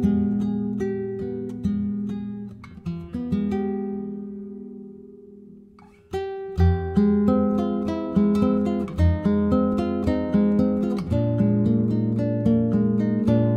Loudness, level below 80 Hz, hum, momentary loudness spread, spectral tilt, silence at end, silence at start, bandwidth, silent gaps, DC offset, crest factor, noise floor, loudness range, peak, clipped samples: -23 LUFS; -38 dBFS; none; 14 LU; -10 dB/octave; 0 s; 0 s; 6.8 kHz; none; under 0.1%; 16 dB; -50 dBFS; 9 LU; -8 dBFS; under 0.1%